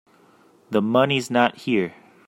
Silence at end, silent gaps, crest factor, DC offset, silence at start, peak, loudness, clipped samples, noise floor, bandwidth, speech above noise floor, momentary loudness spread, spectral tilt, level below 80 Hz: 0.35 s; none; 20 dB; under 0.1%; 0.7 s; -2 dBFS; -21 LUFS; under 0.1%; -55 dBFS; 16 kHz; 35 dB; 6 LU; -5.5 dB/octave; -66 dBFS